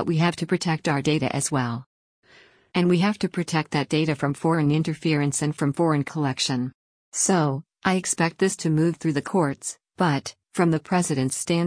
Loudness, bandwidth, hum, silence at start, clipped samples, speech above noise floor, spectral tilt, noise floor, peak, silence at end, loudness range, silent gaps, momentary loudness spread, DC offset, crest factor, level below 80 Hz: -24 LUFS; 10.5 kHz; none; 0 s; under 0.1%; 32 dB; -5 dB/octave; -55 dBFS; -8 dBFS; 0 s; 2 LU; 1.86-2.22 s, 6.74-7.12 s; 5 LU; under 0.1%; 16 dB; -60 dBFS